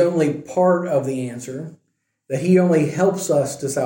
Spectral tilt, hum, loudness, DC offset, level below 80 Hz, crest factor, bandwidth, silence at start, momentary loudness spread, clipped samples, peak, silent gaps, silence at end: -6.5 dB/octave; none; -19 LUFS; under 0.1%; -66 dBFS; 14 dB; 17 kHz; 0 s; 15 LU; under 0.1%; -4 dBFS; none; 0 s